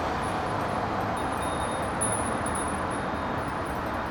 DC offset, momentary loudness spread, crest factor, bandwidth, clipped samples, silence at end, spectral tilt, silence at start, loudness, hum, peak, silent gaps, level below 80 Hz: under 0.1%; 4 LU; 14 dB; over 20 kHz; under 0.1%; 0 s; -4.5 dB/octave; 0 s; -29 LUFS; none; -14 dBFS; none; -44 dBFS